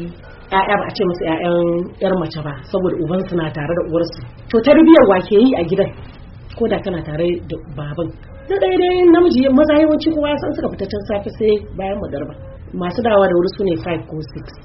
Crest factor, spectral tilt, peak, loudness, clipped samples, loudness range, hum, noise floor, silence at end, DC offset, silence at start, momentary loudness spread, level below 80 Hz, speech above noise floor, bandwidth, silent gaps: 16 dB; -5.5 dB/octave; 0 dBFS; -16 LUFS; under 0.1%; 6 LU; none; -35 dBFS; 0.05 s; under 0.1%; 0 s; 16 LU; -38 dBFS; 19 dB; 5.8 kHz; none